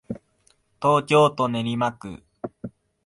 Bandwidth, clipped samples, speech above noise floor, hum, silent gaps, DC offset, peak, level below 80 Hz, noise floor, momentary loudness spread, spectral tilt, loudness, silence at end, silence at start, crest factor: 11.5 kHz; under 0.1%; 43 dB; none; none; under 0.1%; -6 dBFS; -60 dBFS; -64 dBFS; 21 LU; -6 dB/octave; -21 LUFS; 0.4 s; 0.1 s; 18 dB